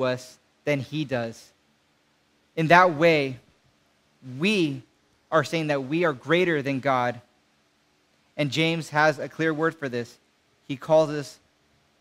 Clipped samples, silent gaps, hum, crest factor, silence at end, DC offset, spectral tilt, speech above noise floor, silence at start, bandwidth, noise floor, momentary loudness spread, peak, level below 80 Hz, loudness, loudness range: under 0.1%; none; none; 24 dB; 0.65 s; under 0.1%; -5.5 dB/octave; 42 dB; 0 s; 15.5 kHz; -66 dBFS; 17 LU; -2 dBFS; -70 dBFS; -24 LUFS; 3 LU